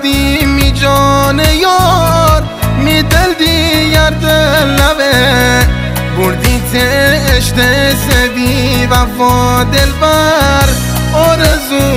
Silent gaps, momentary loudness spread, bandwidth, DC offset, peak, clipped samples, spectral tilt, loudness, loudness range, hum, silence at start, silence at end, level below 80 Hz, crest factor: none; 3 LU; 16.5 kHz; under 0.1%; 0 dBFS; 0.4%; -4.5 dB/octave; -9 LUFS; 1 LU; none; 0 s; 0 s; -18 dBFS; 8 dB